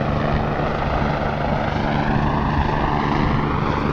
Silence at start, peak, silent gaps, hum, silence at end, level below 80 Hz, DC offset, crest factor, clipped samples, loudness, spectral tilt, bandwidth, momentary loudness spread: 0 s; -6 dBFS; none; none; 0 s; -28 dBFS; under 0.1%; 14 dB; under 0.1%; -21 LUFS; -8 dB/octave; 7 kHz; 2 LU